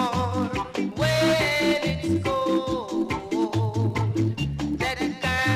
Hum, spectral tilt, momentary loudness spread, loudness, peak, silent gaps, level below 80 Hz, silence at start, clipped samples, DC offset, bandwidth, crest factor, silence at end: none; -5.5 dB/octave; 7 LU; -25 LUFS; -10 dBFS; none; -44 dBFS; 0 s; under 0.1%; under 0.1%; 15.5 kHz; 14 dB; 0 s